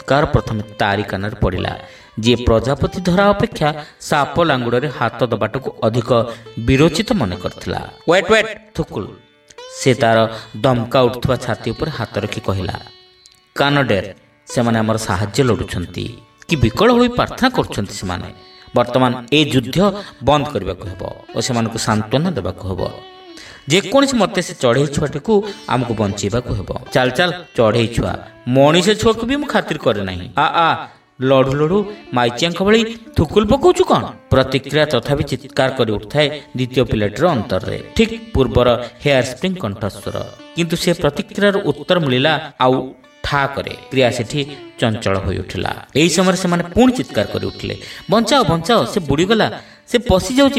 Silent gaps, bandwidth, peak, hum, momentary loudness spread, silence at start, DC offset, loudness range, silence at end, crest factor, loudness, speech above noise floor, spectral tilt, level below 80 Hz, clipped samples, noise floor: none; 16 kHz; 0 dBFS; none; 11 LU; 0 s; under 0.1%; 3 LU; 0 s; 16 dB; -17 LUFS; 33 dB; -5.5 dB/octave; -36 dBFS; under 0.1%; -49 dBFS